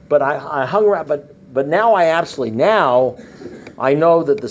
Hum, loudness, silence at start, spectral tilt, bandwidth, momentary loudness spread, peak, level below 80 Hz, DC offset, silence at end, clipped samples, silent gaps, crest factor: none; -16 LUFS; 0.1 s; -6.5 dB/octave; 8 kHz; 11 LU; -2 dBFS; -58 dBFS; under 0.1%; 0 s; under 0.1%; none; 14 dB